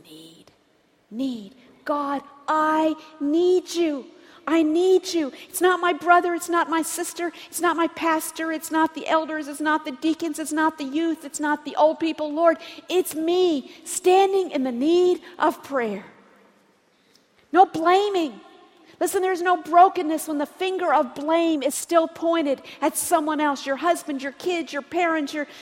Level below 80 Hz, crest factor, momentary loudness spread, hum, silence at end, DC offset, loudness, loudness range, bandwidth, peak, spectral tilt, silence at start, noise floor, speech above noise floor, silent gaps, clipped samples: -72 dBFS; 20 dB; 10 LU; none; 0 s; under 0.1%; -22 LUFS; 3 LU; 16.5 kHz; -4 dBFS; -2.5 dB/octave; 0.1 s; -62 dBFS; 40 dB; none; under 0.1%